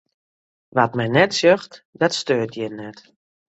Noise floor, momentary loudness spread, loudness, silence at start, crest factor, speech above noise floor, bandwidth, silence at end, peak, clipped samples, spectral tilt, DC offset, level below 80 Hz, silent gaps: under -90 dBFS; 17 LU; -20 LUFS; 0.75 s; 20 dB; over 70 dB; 8.2 kHz; 0.65 s; -2 dBFS; under 0.1%; -4.5 dB/octave; under 0.1%; -62 dBFS; 1.85-1.93 s